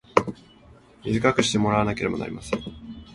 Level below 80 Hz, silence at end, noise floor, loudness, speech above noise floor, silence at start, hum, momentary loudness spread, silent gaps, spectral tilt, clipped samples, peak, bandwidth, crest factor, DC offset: -48 dBFS; 0 s; -51 dBFS; -24 LUFS; 28 dB; 0.15 s; none; 16 LU; none; -5 dB/octave; under 0.1%; -2 dBFS; 11.5 kHz; 24 dB; under 0.1%